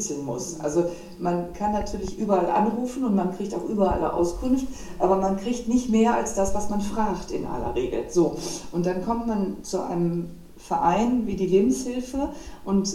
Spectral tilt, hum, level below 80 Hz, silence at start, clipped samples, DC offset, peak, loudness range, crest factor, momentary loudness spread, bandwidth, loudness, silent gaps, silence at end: -6 dB/octave; none; -42 dBFS; 0 s; under 0.1%; under 0.1%; -8 dBFS; 3 LU; 16 dB; 9 LU; 15.5 kHz; -25 LUFS; none; 0 s